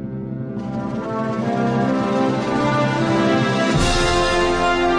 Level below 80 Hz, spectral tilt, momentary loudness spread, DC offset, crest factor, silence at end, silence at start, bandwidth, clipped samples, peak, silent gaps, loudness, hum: -32 dBFS; -5.5 dB/octave; 9 LU; under 0.1%; 14 dB; 0 s; 0 s; 10.5 kHz; under 0.1%; -6 dBFS; none; -19 LUFS; none